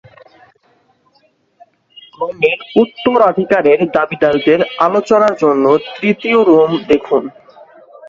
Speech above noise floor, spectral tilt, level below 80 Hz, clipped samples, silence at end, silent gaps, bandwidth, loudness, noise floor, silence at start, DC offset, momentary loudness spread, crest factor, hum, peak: 44 dB; -6.5 dB/octave; -54 dBFS; under 0.1%; 0 s; none; 7.4 kHz; -13 LUFS; -56 dBFS; 2.2 s; under 0.1%; 6 LU; 14 dB; none; 0 dBFS